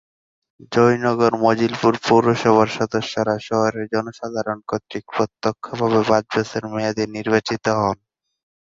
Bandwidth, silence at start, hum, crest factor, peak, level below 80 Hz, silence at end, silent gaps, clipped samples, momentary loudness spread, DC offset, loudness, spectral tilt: 7.8 kHz; 0.7 s; none; 18 dB; -2 dBFS; -56 dBFS; 0.8 s; none; under 0.1%; 10 LU; under 0.1%; -20 LUFS; -6 dB/octave